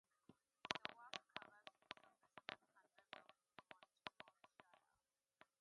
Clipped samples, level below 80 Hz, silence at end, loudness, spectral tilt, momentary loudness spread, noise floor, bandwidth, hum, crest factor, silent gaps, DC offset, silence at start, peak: under 0.1%; under -90 dBFS; 0.8 s; -56 LUFS; -2 dB/octave; 17 LU; under -90 dBFS; 11 kHz; none; 42 dB; none; under 0.1%; 0.3 s; -18 dBFS